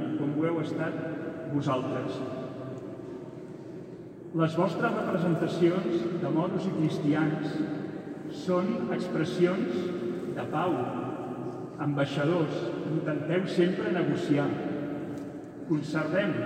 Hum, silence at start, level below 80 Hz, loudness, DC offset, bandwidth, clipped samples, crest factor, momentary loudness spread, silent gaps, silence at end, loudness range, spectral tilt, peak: none; 0 s; -68 dBFS; -30 LUFS; under 0.1%; 9.4 kHz; under 0.1%; 18 dB; 12 LU; none; 0 s; 5 LU; -7.5 dB/octave; -12 dBFS